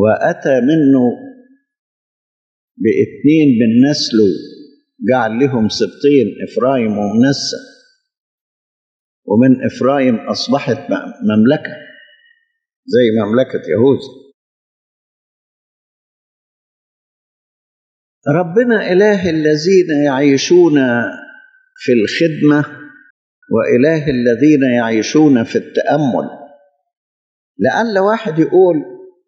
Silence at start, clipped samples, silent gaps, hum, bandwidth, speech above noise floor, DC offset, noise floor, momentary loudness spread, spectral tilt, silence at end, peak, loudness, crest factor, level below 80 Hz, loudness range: 0 s; under 0.1%; 1.79-2.75 s, 8.20-9.23 s, 12.76-12.83 s, 14.34-18.22 s, 23.10-23.42 s, 26.97-27.55 s; none; 7.8 kHz; 43 dB; under 0.1%; -56 dBFS; 8 LU; -6 dB/octave; 0.2 s; 0 dBFS; -13 LUFS; 14 dB; -58 dBFS; 4 LU